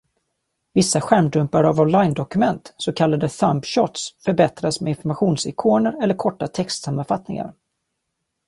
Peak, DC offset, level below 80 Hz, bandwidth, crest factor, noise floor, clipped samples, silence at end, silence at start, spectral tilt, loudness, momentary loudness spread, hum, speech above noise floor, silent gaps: -2 dBFS; under 0.1%; -56 dBFS; 11.5 kHz; 18 dB; -77 dBFS; under 0.1%; 0.95 s; 0.75 s; -5.5 dB/octave; -20 LUFS; 8 LU; none; 58 dB; none